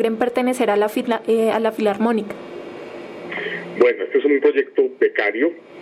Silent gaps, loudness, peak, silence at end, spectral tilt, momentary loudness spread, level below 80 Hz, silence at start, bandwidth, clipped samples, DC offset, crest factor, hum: none; -19 LUFS; -2 dBFS; 0 s; -5.5 dB/octave; 16 LU; -68 dBFS; 0 s; 15 kHz; under 0.1%; under 0.1%; 16 dB; none